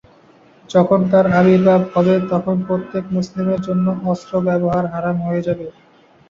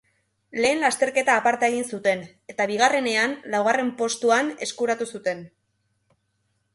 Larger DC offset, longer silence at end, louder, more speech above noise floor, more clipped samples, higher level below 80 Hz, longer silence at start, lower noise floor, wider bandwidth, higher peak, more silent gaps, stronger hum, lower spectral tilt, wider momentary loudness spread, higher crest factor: neither; second, 0.6 s vs 1.3 s; first, -17 LUFS vs -23 LUFS; second, 33 dB vs 49 dB; neither; first, -52 dBFS vs -70 dBFS; first, 0.7 s vs 0.55 s; second, -49 dBFS vs -72 dBFS; second, 7.2 kHz vs 11.5 kHz; first, -2 dBFS vs -6 dBFS; neither; neither; first, -8.5 dB/octave vs -2.5 dB/octave; about the same, 9 LU vs 10 LU; about the same, 16 dB vs 18 dB